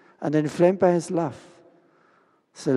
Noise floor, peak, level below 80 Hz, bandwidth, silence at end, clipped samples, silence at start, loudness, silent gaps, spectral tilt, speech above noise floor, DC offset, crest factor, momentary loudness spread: -62 dBFS; -6 dBFS; -70 dBFS; 11.5 kHz; 0 s; under 0.1%; 0.2 s; -23 LUFS; none; -7 dB/octave; 40 dB; under 0.1%; 18 dB; 11 LU